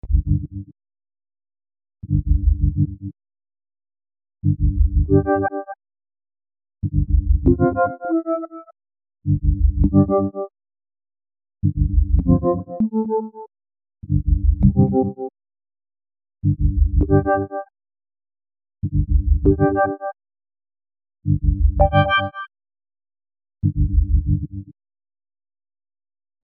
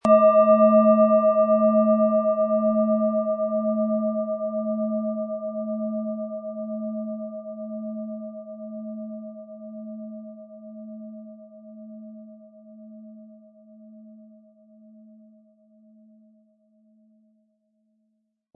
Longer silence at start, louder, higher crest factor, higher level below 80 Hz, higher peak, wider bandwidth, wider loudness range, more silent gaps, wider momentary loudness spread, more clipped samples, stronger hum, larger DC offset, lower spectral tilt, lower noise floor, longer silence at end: about the same, 0.05 s vs 0.05 s; about the same, -20 LUFS vs -22 LUFS; about the same, 18 dB vs 18 dB; first, -24 dBFS vs -76 dBFS; first, -2 dBFS vs -6 dBFS; second, 3.3 kHz vs 3.8 kHz; second, 5 LU vs 24 LU; neither; second, 15 LU vs 26 LU; neither; neither; neither; second, -7.5 dB/octave vs -10 dB/octave; first, under -90 dBFS vs -73 dBFS; second, 1.75 s vs 4.4 s